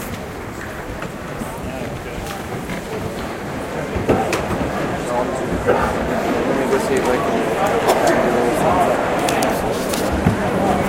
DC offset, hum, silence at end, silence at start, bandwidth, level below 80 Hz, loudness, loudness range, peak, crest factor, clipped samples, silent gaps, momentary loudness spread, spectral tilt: under 0.1%; none; 0 s; 0 s; 16 kHz; -36 dBFS; -20 LUFS; 9 LU; 0 dBFS; 18 dB; under 0.1%; none; 12 LU; -5 dB/octave